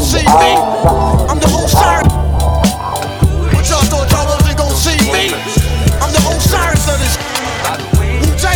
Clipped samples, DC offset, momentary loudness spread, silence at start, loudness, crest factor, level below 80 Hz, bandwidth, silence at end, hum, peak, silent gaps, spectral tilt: 0.3%; under 0.1%; 5 LU; 0 s; -12 LUFS; 12 dB; -16 dBFS; 19 kHz; 0 s; none; 0 dBFS; none; -4.5 dB/octave